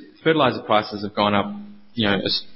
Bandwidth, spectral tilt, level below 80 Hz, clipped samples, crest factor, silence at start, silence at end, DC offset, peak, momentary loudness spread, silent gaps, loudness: 5.8 kHz; -9 dB/octave; -52 dBFS; under 0.1%; 18 dB; 0 s; 0 s; under 0.1%; -4 dBFS; 12 LU; none; -21 LUFS